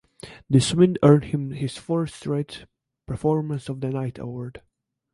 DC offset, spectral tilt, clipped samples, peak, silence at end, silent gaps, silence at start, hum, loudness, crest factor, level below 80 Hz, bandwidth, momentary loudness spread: under 0.1%; -7 dB/octave; under 0.1%; -4 dBFS; 0.55 s; none; 0.25 s; none; -23 LUFS; 20 dB; -52 dBFS; 11.5 kHz; 18 LU